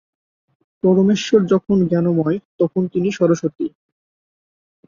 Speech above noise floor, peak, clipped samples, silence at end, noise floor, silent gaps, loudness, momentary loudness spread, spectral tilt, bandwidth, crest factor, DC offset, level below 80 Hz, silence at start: over 73 dB; -2 dBFS; under 0.1%; 1.2 s; under -90 dBFS; 2.45-2.59 s; -18 LUFS; 7 LU; -7 dB/octave; 7.4 kHz; 16 dB; under 0.1%; -58 dBFS; 0.85 s